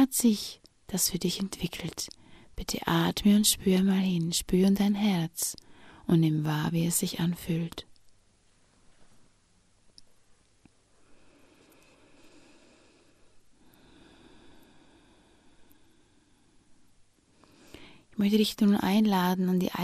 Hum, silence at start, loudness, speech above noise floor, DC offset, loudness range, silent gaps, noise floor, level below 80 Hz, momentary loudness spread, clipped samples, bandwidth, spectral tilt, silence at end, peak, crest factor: none; 0 s; -27 LUFS; 39 dB; under 0.1%; 10 LU; none; -65 dBFS; -54 dBFS; 14 LU; under 0.1%; 15.5 kHz; -5 dB/octave; 0 s; -10 dBFS; 20 dB